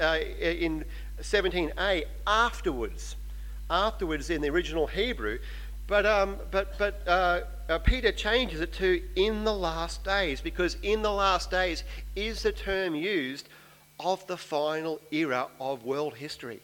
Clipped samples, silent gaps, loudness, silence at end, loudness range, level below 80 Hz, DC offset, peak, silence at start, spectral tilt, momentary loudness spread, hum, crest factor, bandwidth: under 0.1%; none; -29 LUFS; 0.05 s; 4 LU; -38 dBFS; under 0.1%; -8 dBFS; 0 s; -4.5 dB/octave; 11 LU; none; 20 dB; 18 kHz